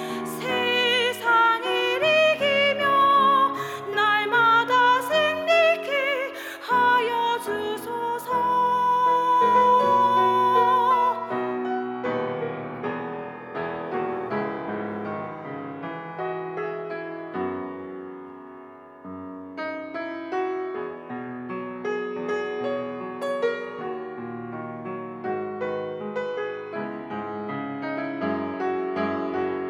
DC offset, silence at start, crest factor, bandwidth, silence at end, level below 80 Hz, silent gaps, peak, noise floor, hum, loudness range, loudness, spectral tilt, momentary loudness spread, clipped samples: under 0.1%; 0 s; 16 dB; 16.5 kHz; 0 s; -74 dBFS; none; -8 dBFS; -44 dBFS; none; 13 LU; -24 LUFS; -4.5 dB/octave; 16 LU; under 0.1%